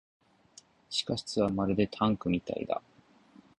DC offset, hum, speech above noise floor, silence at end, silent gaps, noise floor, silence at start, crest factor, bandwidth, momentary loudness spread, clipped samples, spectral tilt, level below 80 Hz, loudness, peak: under 0.1%; none; 30 dB; 0.8 s; none; -61 dBFS; 0.9 s; 20 dB; 11 kHz; 6 LU; under 0.1%; -5.5 dB/octave; -58 dBFS; -31 LUFS; -12 dBFS